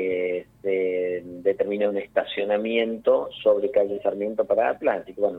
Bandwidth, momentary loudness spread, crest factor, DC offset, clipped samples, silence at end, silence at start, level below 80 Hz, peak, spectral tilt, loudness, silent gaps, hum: 4.1 kHz; 5 LU; 16 dB; under 0.1%; under 0.1%; 0 s; 0 s; -64 dBFS; -8 dBFS; -7 dB/octave; -24 LUFS; none; none